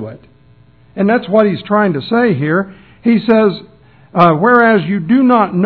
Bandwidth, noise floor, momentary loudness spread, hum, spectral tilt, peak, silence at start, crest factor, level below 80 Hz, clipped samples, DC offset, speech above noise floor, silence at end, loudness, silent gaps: 5.4 kHz; -46 dBFS; 11 LU; none; -10 dB/octave; 0 dBFS; 0 s; 12 dB; -54 dBFS; 0.2%; 0.2%; 34 dB; 0 s; -12 LUFS; none